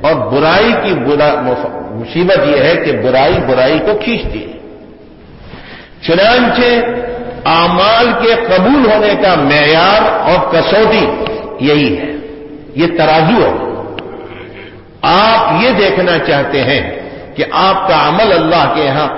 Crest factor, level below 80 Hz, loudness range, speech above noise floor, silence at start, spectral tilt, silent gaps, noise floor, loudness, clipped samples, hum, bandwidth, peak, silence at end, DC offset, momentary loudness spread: 10 dB; -34 dBFS; 5 LU; 25 dB; 0 s; -9 dB/octave; none; -35 dBFS; -10 LUFS; under 0.1%; none; 5.8 kHz; 0 dBFS; 0 s; under 0.1%; 15 LU